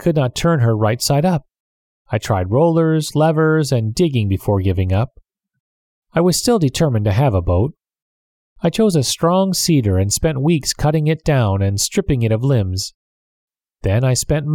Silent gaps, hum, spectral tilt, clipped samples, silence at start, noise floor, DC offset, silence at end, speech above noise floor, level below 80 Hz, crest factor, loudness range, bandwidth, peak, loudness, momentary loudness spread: 1.60-2.05 s, 5.60-6.02 s, 8.02-8.56 s, 12.94-13.48 s; none; -5.5 dB/octave; under 0.1%; 0 s; under -90 dBFS; under 0.1%; 0 s; over 74 dB; -38 dBFS; 14 dB; 2 LU; 17.5 kHz; -4 dBFS; -17 LUFS; 6 LU